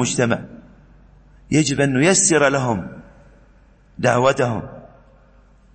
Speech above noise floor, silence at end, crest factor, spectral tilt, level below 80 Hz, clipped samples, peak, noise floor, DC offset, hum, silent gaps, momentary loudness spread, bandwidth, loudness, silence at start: 33 dB; 0.9 s; 20 dB; -4 dB/octave; -48 dBFS; under 0.1%; -2 dBFS; -51 dBFS; under 0.1%; none; none; 15 LU; 8.8 kHz; -18 LUFS; 0 s